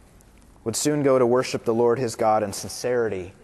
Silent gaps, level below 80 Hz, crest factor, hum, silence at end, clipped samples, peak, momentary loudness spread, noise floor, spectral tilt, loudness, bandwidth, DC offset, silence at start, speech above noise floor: none; -58 dBFS; 14 dB; none; 0.15 s; under 0.1%; -8 dBFS; 9 LU; -51 dBFS; -5 dB/octave; -23 LUFS; 12.5 kHz; under 0.1%; 0.65 s; 29 dB